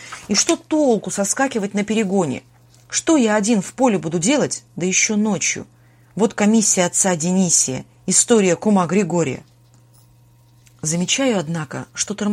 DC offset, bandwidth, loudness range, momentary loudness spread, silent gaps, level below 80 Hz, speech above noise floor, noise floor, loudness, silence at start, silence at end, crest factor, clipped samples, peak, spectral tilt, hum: under 0.1%; 15.5 kHz; 4 LU; 10 LU; none; -60 dBFS; 33 dB; -51 dBFS; -18 LUFS; 0 s; 0 s; 18 dB; under 0.1%; 0 dBFS; -3.5 dB/octave; none